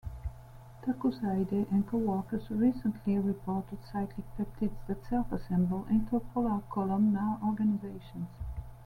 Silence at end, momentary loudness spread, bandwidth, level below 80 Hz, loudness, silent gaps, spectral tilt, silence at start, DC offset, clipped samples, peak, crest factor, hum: 0 s; 13 LU; 4.9 kHz; -48 dBFS; -32 LUFS; none; -9.5 dB/octave; 0.05 s; under 0.1%; under 0.1%; -16 dBFS; 16 dB; none